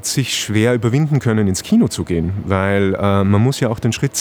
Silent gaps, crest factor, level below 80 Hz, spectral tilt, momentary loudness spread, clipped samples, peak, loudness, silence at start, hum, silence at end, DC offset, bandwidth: none; 16 dB; -46 dBFS; -5.5 dB/octave; 4 LU; under 0.1%; 0 dBFS; -16 LUFS; 0.05 s; none; 0 s; under 0.1%; over 20 kHz